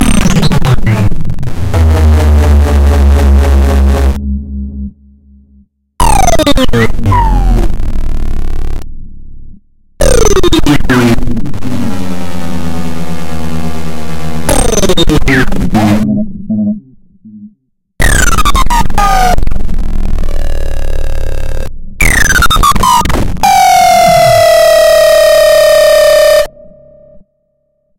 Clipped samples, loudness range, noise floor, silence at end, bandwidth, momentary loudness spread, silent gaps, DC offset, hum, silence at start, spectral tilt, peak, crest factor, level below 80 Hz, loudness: under 0.1%; 9 LU; -60 dBFS; 0 s; 17 kHz; 14 LU; none; under 0.1%; none; 0 s; -5 dB/octave; 0 dBFS; 8 dB; -12 dBFS; -9 LUFS